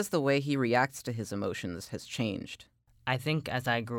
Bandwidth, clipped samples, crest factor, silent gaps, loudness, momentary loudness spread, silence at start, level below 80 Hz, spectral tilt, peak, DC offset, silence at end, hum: 20 kHz; under 0.1%; 18 dB; none; -32 LUFS; 12 LU; 0 s; -64 dBFS; -5.5 dB/octave; -14 dBFS; under 0.1%; 0 s; none